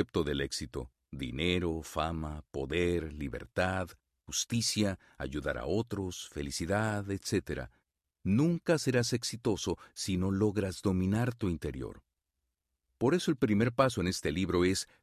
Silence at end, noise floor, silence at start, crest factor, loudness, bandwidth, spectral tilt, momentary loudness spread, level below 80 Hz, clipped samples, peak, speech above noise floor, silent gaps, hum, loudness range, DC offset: 0.15 s; -86 dBFS; 0 s; 20 dB; -33 LUFS; 14 kHz; -5 dB/octave; 11 LU; -48 dBFS; under 0.1%; -12 dBFS; 54 dB; none; none; 3 LU; under 0.1%